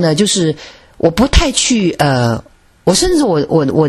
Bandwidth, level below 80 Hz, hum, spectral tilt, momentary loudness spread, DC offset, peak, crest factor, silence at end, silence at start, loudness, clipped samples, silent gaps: 14 kHz; -24 dBFS; none; -4.5 dB/octave; 7 LU; under 0.1%; 0 dBFS; 12 dB; 0 s; 0 s; -13 LUFS; under 0.1%; none